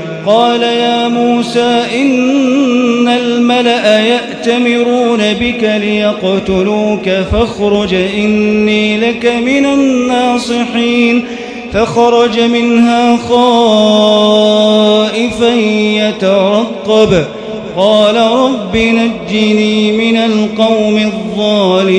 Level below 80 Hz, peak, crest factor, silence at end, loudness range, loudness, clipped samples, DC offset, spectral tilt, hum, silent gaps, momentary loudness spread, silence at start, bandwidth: -36 dBFS; 0 dBFS; 10 dB; 0 s; 3 LU; -10 LUFS; 0.3%; under 0.1%; -5 dB/octave; none; none; 5 LU; 0 s; 10.5 kHz